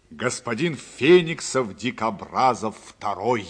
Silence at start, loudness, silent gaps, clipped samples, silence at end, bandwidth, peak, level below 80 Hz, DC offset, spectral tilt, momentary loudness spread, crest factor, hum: 0.1 s; -23 LUFS; none; under 0.1%; 0 s; 10 kHz; -4 dBFS; -62 dBFS; under 0.1%; -4.5 dB/octave; 12 LU; 18 dB; none